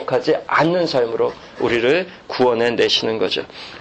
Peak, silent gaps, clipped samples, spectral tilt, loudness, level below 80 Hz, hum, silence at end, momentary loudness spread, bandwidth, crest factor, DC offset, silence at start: -4 dBFS; none; under 0.1%; -4.5 dB/octave; -18 LUFS; -54 dBFS; none; 0 s; 7 LU; 8.6 kHz; 16 dB; under 0.1%; 0 s